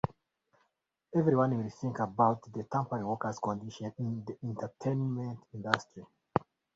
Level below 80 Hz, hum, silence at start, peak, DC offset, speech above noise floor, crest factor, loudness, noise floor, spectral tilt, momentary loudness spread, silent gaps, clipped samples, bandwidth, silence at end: -64 dBFS; none; 1.1 s; -4 dBFS; under 0.1%; 48 dB; 30 dB; -34 LUFS; -80 dBFS; -7 dB/octave; 11 LU; none; under 0.1%; 7.8 kHz; 0.4 s